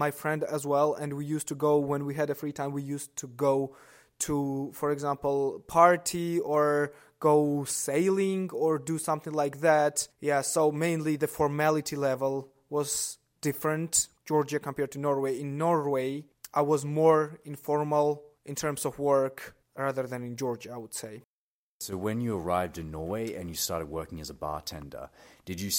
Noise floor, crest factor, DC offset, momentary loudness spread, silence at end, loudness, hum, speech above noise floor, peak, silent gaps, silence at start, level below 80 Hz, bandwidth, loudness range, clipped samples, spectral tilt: under -90 dBFS; 22 dB; under 0.1%; 13 LU; 0 s; -29 LUFS; none; over 61 dB; -6 dBFS; 21.25-21.80 s; 0 s; -60 dBFS; 16.5 kHz; 7 LU; under 0.1%; -4.5 dB/octave